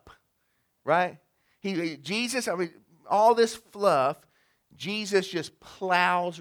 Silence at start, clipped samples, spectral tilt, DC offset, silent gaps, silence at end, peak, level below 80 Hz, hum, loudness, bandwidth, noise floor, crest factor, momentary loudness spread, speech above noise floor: 0.05 s; under 0.1%; -4 dB/octave; under 0.1%; none; 0 s; -8 dBFS; -72 dBFS; none; -26 LUFS; 19.5 kHz; -74 dBFS; 20 dB; 14 LU; 47 dB